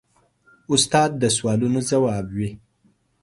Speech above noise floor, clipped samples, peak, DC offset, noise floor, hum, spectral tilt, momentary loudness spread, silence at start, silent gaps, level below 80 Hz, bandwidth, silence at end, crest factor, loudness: 42 dB; under 0.1%; -4 dBFS; under 0.1%; -63 dBFS; none; -4 dB/octave; 10 LU; 0.7 s; none; -52 dBFS; 11.5 kHz; 0.65 s; 18 dB; -21 LUFS